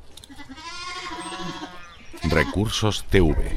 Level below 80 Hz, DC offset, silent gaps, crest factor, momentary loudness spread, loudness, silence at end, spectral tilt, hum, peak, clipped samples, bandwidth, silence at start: -32 dBFS; under 0.1%; none; 20 dB; 22 LU; -24 LUFS; 0 s; -5 dB/octave; none; -4 dBFS; under 0.1%; 16 kHz; 0 s